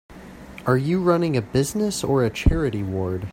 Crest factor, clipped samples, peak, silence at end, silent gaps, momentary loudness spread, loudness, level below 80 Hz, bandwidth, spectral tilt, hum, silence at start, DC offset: 20 dB; under 0.1%; -2 dBFS; 0 s; none; 8 LU; -22 LUFS; -32 dBFS; 16 kHz; -6 dB/octave; none; 0.1 s; under 0.1%